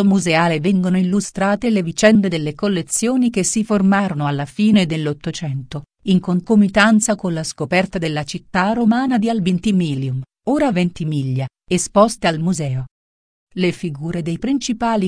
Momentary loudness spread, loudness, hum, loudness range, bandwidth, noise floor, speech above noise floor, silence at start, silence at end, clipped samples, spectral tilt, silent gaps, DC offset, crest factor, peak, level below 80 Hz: 10 LU; -18 LUFS; none; 3 LU; 10.5 kHz; under -90 dBFS; over 73 dB; 0 s; 0 s; under 0.1%; -5.5 dB/octave; 12.91-13.47 s; under 0.1%; 16 dB; 0 dBFS; -48 dBFS